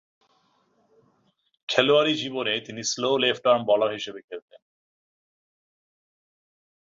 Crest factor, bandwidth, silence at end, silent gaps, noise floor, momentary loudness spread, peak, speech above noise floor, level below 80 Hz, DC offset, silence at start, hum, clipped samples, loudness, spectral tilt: 24 dB; 7.8 kHz; 2.45 s; 4.24-4.28 s; -68 dBFS; 20 LU; -2 dBFS; 44 dB; -72 dBFS; under 0.1%; 1.7 s; none; under 0.1%; -23 LUFS; -3 dB/octave